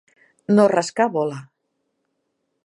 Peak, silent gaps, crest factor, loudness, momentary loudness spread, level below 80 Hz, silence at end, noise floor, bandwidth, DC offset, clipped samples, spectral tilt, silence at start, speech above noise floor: -2 dBFS; none; 20 dB; -19 LUFS; 20 LU; -74 dBFS; 1.2 s; -74 dBFS; 11 kHz; under 0.1%; under 0.1%; -6 dB/octave; 0.5 s; 56 dB